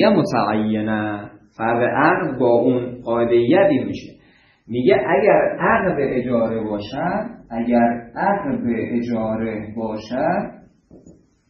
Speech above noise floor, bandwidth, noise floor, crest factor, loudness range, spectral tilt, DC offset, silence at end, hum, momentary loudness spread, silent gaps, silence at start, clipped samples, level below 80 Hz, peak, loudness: 35 dB; 10.5 kHz; -54 dBFS; 18 dB; 4 LU; -8 dB/octave; under 0.1%; 0.4 s; none; 11 LU; none; 0 s; under 0.1%; -52 dBFS; -2 dBFS; -19 LUFS